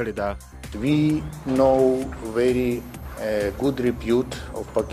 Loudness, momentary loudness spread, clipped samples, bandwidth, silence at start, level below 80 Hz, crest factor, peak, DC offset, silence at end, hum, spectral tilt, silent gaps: -23 LUFS; 12 LU; under 0.1%; 15.5 kHz; 0 s; -40 dBFS; 16 dB; -6 dBFS; under 0.1%; 0 s; none; -7 dB/octave; none